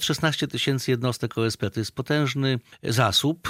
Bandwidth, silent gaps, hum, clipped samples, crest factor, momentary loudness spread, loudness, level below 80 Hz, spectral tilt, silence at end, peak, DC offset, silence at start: 16 kHz; none; none; under 0.1%; 20 dB; 8 LU; -24 LUFS; -58 dBFS; -4.5 dB/octave; 0 s; -6 dBFS; under 0.1%; 0 s